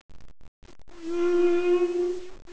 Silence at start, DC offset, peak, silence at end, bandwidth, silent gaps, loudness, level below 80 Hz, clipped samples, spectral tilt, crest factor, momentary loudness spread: 0.1 s; under 0.1%; -12 dBFS; 0 s; 8 kHz; 0.48-0.62 s; -25 LUFS; -54 dBFS; under 0.1%; -5.5 dB/octave; 14 dB; 13 LU